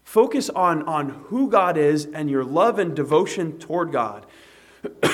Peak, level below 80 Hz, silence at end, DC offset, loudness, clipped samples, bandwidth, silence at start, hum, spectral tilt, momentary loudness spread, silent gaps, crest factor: -4 dBFS; -66 dBFS; 0 s; under 0.1%; -21 LUFS; under 0.1%; 15.5 kHz; 0.05 s; none; -5.5 dB/octave; 9 LU; none; 18 dB